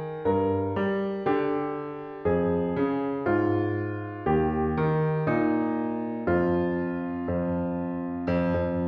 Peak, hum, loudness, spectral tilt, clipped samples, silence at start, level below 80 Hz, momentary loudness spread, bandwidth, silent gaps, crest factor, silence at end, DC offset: -10 dBFS; none; -27 LUFS; -10.5 dB/octave; under 0.1%; 0 s; -48 dBFS; 6 LU; 5.4 kHz; none; 16 dB; 0 s; under 0.1%